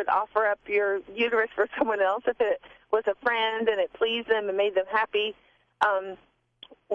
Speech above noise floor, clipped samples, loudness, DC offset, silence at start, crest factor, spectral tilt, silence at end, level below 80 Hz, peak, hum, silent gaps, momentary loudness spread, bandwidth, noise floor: 27 dB; under 0.1%; -26 LUFS; under 0.1%; 0 s; 18 dB; -4.5 dB/octave; 0 s; -66 dBFS; -8 dBFS; none; none; 4 LU; 7.2 kHz; -53 dBFS